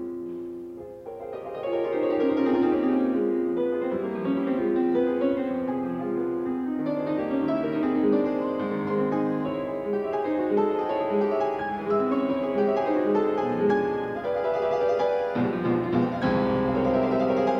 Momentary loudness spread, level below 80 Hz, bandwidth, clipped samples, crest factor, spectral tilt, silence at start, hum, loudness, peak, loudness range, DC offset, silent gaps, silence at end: 6 LU; -56 dBFS; 6.4 kHz; under 0.1%; 14 dB; -8.5 dB/octave; 0 s; none; -26 LUFS; -12 dBFS; 2 LU; under 0.1%; none; 0 s